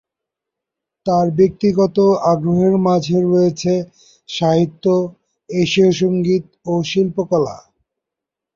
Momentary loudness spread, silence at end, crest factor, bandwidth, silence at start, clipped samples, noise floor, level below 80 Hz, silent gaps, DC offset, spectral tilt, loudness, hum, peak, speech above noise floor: 8 LU; 0.95 s; 16 dB; 7.4 kHz; 1.05 s; under 0.1%; -84 dBFS; -52 dBFS; none; under 0.1%; -7 dB/octave; -16 LUFS; none; -2 dBFS; 68 dB